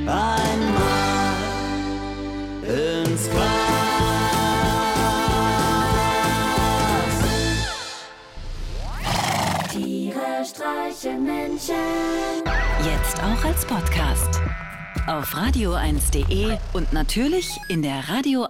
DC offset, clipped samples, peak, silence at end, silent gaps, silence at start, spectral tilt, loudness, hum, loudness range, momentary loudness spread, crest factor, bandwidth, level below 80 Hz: under 0.1%; under 0.1%; -10 dBFS; 0 s; none; 0 s; -4.5 dB/octave; -22 LUFS; none; 5 LU; 9 LU; 12 dB; 17.5 kHz; -30 dBFS